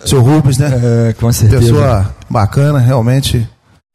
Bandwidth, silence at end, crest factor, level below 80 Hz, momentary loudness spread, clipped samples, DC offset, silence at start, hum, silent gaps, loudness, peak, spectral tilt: 15 kHz; 0.45 s; 8 dB; -28 dBFS; 7 LU; under 0.1%; under 0.1%; 0.05 s; none; none; -11 LUFS; 0 dBFS; -6.5 dB/octave